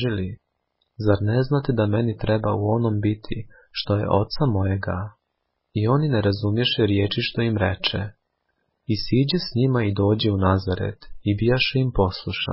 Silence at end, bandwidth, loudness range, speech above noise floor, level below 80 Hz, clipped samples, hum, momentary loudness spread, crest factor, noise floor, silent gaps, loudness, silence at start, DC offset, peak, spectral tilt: 0 s; 5.8 kHz; 2 LU; 55 dB; -40 dBFS; under 0.1%; none; 10 LU; 18 dB; -76 dBFS; none; -22 LUFS; 0 s; under 0.1%; -6 dBFS; -10.5 dB/octave